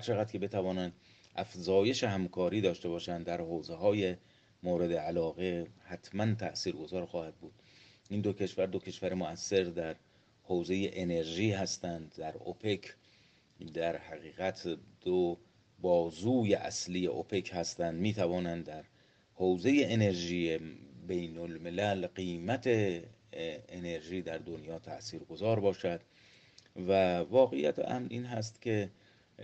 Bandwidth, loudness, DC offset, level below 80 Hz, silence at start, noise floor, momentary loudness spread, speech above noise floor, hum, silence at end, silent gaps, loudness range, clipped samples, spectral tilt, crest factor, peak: 8.6 kHz; -34 LUFS; under 0.1%; -66 dBFS; 0 s; -66 dBFS; 14 LU; 32 dB; none; 0 s; none; 5 LU; under 0.1%; -5.5 dB/octave; 20 dB; -14 dBFS